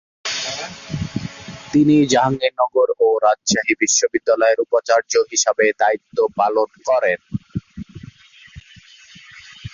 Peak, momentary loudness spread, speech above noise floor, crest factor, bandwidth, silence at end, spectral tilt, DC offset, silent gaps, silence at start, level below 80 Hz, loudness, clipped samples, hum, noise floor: -2 dBFS; 14 LU; 29 dB; 16 dB; 7.6 kHz; 0.05 s; -3.5 dB/octave; under 0.1%; none; 0.25 s; -50 dBFS; -18 LUFS; under 0.1%; none; -46 dBFS